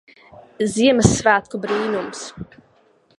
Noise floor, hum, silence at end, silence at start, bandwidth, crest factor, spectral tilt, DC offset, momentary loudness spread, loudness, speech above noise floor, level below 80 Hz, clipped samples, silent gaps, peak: -57 dBFS; none; 0.75 s; 0.6 s; 11.5 kHz; 20 dB; -4.5 dB/octave; under 0.1%; 19 LU; -18 LUFS; 38 dB; -42 dBFS; under 0.1%; none; 0 dBFS